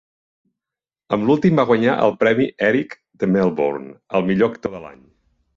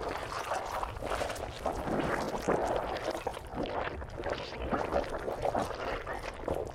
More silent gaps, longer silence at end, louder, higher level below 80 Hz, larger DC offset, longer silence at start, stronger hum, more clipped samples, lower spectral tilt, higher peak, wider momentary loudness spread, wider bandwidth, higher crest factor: neither; first, 0.65 s vs 0 s; first, -18 LUFS vs -35 LUFS; second, -56 dBFS vs -46 dBFS; neither; first, 1.1 s vs 0 s; neither; neither; first, -8 dB/octave vs -5 dB/octave; first, -2 dBFS vs -16 dBFS; first, 13 LU vs 6 LU; second, 7.2 kHz vs 17 kHz; about the same, 18 dB vs 18 dB